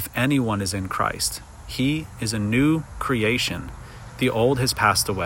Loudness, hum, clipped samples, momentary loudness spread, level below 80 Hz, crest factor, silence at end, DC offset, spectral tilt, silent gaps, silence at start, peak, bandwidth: -22 LUFS; none; under 0.1%; 14 LU; -44 dBFS; 20 dB; 0 s; under 0.1%; -4.5 dB/octave; none; 0 s; -4 dBFS; 16.5 kHz